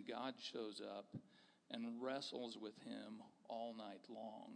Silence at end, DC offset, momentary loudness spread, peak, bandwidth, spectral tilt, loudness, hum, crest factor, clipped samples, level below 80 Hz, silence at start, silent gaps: 0 s; under 0.1%; 11 LU; -32 dBFS; 10 kHz; -4.5 dB/octave; -51 LUFS; none; 20 dB; under 0.1%; under -90 dBFS; 0 s; none